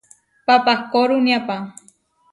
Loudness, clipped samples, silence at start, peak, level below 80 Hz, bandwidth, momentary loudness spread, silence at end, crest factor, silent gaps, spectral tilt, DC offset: -18 LUFS; under 0.1%; 0.5 s; 0 dBFS; -66 dBFS; 11.5 kHz; 13 LU; 0.6 s; 18 dB; none; -4.5 dB/octave; under 0.1%